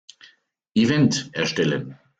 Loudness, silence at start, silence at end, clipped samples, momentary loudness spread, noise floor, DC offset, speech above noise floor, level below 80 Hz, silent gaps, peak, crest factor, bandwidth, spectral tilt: -22 LUFS; 0.75 s; 0.25 s; under 0.1%; 7 LU; -58 dBFS; under 0.1%; 37 dB; -58 dBFS; none; -6 dBFS; 18 dB; 9.2 kHz; -5 dB/octave